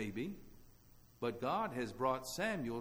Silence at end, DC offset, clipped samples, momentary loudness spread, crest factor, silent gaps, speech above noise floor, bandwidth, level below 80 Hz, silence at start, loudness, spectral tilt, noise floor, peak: 0 s; under 0.1%; under 0.1%; 7 LU; 18 dB; none; 24 dB; over 20 kHz; -62 dBFS; 0 s; -40 LUFS; -5 dB/octave; -63 dBFS; -22 dBFS